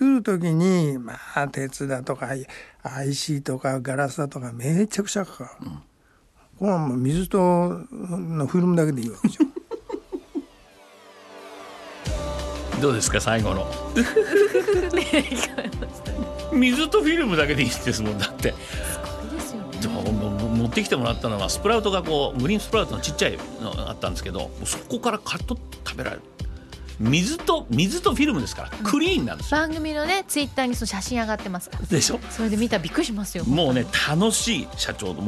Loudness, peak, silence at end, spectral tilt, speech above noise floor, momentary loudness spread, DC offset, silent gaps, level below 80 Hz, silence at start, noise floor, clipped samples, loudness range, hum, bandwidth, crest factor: -24 LUFS; -6 dBFS; 0 s; -4.5 dB/octave; 35 dB; 13 LU; under 0.1%; none; -40 dBFS; 0 s; -58 dBFS; under 0.1%; 6 LU; none; 13 kHz; 18 dB